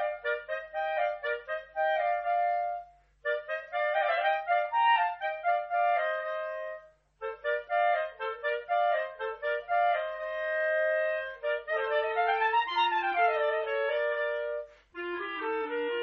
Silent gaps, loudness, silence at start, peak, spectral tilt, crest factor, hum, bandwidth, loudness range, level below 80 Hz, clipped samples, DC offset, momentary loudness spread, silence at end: none; -30 LUFS; 0 s; -16 dBFS; 2 dB/octave; 16 dB; none; 6 kHz; 3 LU; -70 dBFS; under 0.1%; under 0.1%; 9 LU; 0 s